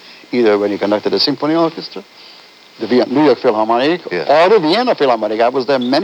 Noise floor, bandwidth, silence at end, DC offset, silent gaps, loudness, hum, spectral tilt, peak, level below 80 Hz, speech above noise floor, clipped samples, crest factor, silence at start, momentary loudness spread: -41 dBFS; 10 kHz; 0 s; under 0.1%; none; -14 LUFS; none; -6 dB/octave; 0 dBFS; -74 dBFS; 28 dB; under 0.1%; 14 dB; 0.1 s; 8 LU